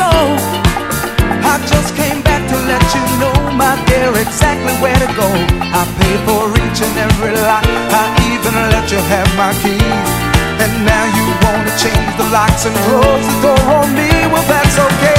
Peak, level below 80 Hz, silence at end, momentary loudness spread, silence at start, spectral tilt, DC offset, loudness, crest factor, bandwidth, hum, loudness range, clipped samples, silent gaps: 0 dBFS; -22 dBFS; 0 s; 4 LU; 0 s; -4.5 dB/octave; under 0.1%; -12 LUFS; 12 dB; 16.5 kHz; none; 2 LU; 0.2%; none